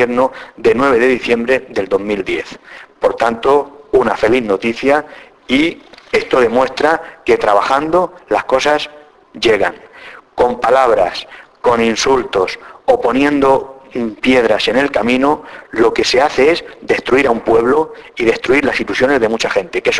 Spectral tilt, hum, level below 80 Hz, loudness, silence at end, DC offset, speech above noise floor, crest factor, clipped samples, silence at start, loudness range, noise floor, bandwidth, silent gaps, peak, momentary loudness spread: -4 dB/octave; none; -44 dBFS; -14 LUFS; 0 s; under 0.1%; 23 dB; 14 dB; under 0.1%; 0 s; 2 LU; -37 dBFS; 11 kHz; none; 0 dBFS; 9 LU